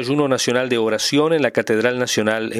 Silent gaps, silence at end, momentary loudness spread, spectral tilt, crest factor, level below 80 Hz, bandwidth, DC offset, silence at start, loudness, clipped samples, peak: none; 0 s; 2 LU; -4 dB/octave; 18 dB; -62 dBFS; 15.5 kHz; under 0.1%; 0 s; -18 LUFS; under 0.1%; 0 dBFS